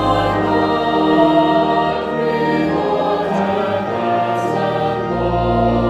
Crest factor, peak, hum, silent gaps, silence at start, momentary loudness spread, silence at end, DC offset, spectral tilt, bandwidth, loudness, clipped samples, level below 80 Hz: 14 dB; -2 dBFS; none; none; 0 s; 6 LU; 0 s; under 0.1%; -7 dB/octave; 12 kHz; -16 LUFS; under 0.1%; -36 dBFS